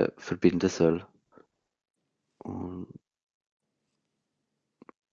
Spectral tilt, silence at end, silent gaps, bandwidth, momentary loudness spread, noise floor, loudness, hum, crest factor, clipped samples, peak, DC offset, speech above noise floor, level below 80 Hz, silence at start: -6.5 dB/octave; 2.3 s; none; 7.6 kHz; 19 LU; -82 dBFS; -28 LUFS; none; 24 dB; under 0.1%; -8 dBFS; under 0.1%; 54 dB; -66 dBFS; 0 s